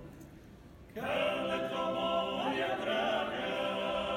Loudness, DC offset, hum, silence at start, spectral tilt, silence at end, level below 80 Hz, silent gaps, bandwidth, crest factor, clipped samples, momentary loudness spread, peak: -34 LUFS; under 0.1%; none; 0 s; -4.5 dB/octave; 0 s; -62 dBFS; none; 16.5 kHz; 14 dB; under 0.1%; 17 LU; -20 dBFS